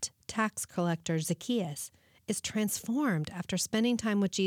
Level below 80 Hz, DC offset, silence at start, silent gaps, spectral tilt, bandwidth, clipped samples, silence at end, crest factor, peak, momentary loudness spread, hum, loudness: -68 dBFS; under 0.1%; 0 s; none; -4.5 dB/octave; 19 kHz; under 0.1%; 0 s; 16 dB; -16 dBFS; 8 LU; none; -32 LUFS